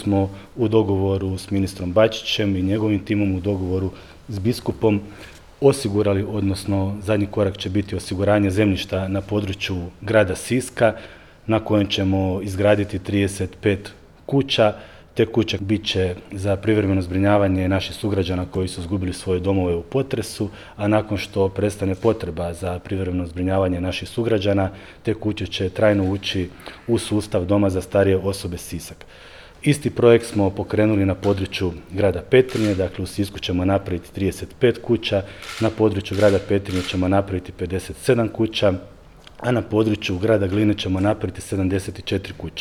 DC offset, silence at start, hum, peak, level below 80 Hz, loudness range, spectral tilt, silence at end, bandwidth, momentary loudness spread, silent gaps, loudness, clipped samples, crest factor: under 0.1%; 0 s; none; 0 dBFS; -46 dBFS; 2 LU; -6.5 dB/octave; 0 s; 14.5 kHz; 9 LU; none; -21 LUFS; under 0.1%; 20 dB